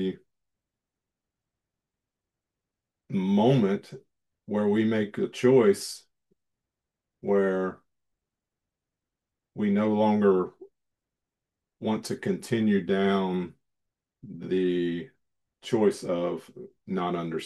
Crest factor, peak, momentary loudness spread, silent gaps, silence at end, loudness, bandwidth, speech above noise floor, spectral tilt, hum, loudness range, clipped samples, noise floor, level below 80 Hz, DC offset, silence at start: 20 dB; -10 dBFS; 16 LU; none; 0 s; -26 LUFS; 12.5 kHz; 62 dB; -6.5 dB/octave; none; 6 LU; under 0.1%; -88 dBFS; -74 dBFS; under 0.1%; 0 s